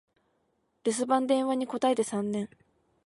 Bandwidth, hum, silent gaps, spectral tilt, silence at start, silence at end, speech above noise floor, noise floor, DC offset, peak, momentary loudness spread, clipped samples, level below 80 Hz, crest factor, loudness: 11.5 kHz; none; none; -4.5 dB/octave; 0.85 s; 0.6 s; 46 dB; -74 dBFS; under 0.1%; -12 dBFS; 8 LU; under 0.1%; -76 dBFS; 18 dB; -29 LUFS